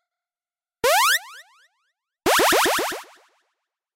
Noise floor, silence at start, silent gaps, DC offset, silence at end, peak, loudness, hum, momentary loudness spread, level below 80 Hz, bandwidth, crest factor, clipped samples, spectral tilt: under -90 dBFS; 0.85 s; none; under 0.1%; 0.95 s; -8 dBFS; -19 LUFS; none; 11 LU; -58 dBFS; 16 kHz; 16 dB; under 0.1%; -0.5 dB/octave